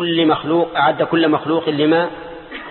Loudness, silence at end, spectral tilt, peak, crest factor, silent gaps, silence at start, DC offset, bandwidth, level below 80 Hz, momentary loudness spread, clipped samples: -16 LUFS; 0 s; -11 dB/octave; -2 dBFS; 14 dB; none; 0 s; under 0.1%; 4.3 kHz; -54 dBFS; 14 LU; under 0.1%